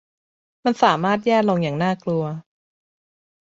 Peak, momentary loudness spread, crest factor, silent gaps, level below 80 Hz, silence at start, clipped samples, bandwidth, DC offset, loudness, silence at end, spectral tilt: -2 dBFS; 8 LU; 20 dB; none; -64 dBFS; 0.65 s; under 0.1%; 7.8 kHz; under 0.1%; -20 LUFS; 1 s; -6.5 dB/octave